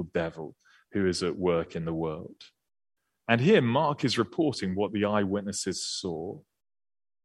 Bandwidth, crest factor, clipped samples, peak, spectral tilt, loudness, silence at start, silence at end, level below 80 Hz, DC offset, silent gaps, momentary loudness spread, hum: 12.5 kHz; 22 dB; under 0.1%; -8 dBFS; -5 dB/octave; -28 LUFS; 0 s; 0.85 s; -62 dBFS; under 0.1%; none; 18 LU; none